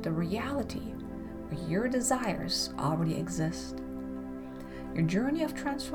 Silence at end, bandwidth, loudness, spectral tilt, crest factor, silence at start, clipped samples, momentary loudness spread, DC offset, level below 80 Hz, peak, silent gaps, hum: 0 s; 19 kHz; -33 LUFS; -5 dB/octave; 16 dB; 0 s; under 0.1%; 12 LU; under 0.1%; -50 dBFS; -16 dBFS; none; none